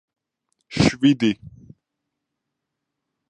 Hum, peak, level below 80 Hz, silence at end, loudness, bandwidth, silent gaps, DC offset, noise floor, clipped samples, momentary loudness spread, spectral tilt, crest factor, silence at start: none; -2 dBFS; -48 dBFS; 1.8 s; -19 LUFS; 10 kHz; none; under 0.1%; -81 dBFS; under 0.1%; 15 LU; -5.5 dB/octave; 22 dB; 0.7 s